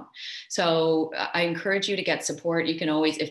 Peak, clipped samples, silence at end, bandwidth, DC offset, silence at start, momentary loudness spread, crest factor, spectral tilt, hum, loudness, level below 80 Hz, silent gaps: -10 dBFS; under 0.1%; 0 s; 12.5 kHz; under 0.1%; 0 s; 5 LU; 16 dB; -4 dB/octave; none; -25 LUFS; -74 dBFS; none